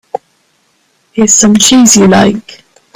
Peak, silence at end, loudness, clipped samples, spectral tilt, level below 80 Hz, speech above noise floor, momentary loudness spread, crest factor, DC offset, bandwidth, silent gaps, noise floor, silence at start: 0 dBFS; 0.4 s; -5 LUFS; 0.5%; -3 dB/octave; -44 dBFS; 48 dB; 18 LU; 10 dB; under 0.1%; over 20 kHz; none; -54 dBFS; 1.15 s